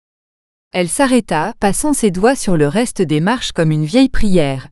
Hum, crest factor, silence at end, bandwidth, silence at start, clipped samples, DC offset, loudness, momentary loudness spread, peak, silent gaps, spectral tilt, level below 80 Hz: none; 14 dB; 0.05 s; 13.5 kHz; 0.75 s; under 0.1%; under 0.1%; -15 LUFS; 4 LU; 0 dBFS; none; -5 dB/octave; -30 dBFS